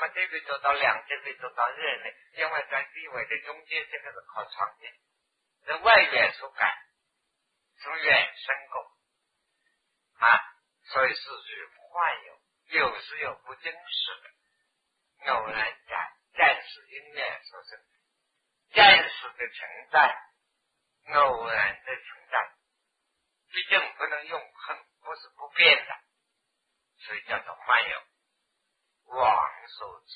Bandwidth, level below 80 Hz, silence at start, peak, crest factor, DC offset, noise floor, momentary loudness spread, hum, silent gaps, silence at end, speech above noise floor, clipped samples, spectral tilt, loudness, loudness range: 5 kHz; -66 dBFS; 0 s; -2 dBFS; 26 dB; under 0.1%; -79 dBFS; 21 LU; none; none; 0 s; 52 dB; under 0.1%; -4 dB/octave; -25 LUFS; 9 LU